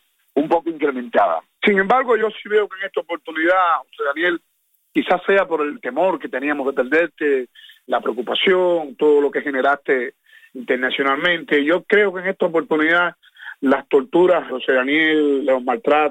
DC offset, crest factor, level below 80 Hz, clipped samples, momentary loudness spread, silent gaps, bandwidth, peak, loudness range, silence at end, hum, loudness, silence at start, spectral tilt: under 0.1%; 16 dB; -64 dBFS; under 0.1%; 8 LU; none; 8.8 kHz; -2 dBFS; 2 LU; 0 s; none; -18 LUFS; 0.35 s; -6 dB/octave